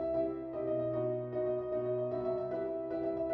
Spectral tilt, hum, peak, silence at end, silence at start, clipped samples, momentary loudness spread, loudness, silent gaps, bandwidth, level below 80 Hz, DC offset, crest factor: -11 dB/octave; none; -24 dBFS; 0 s; 0 s; under 0.1%; 3 LU; -36 LUFS; none; 4.7 kHz; -64 dBFS; under 0.1%; 12 dB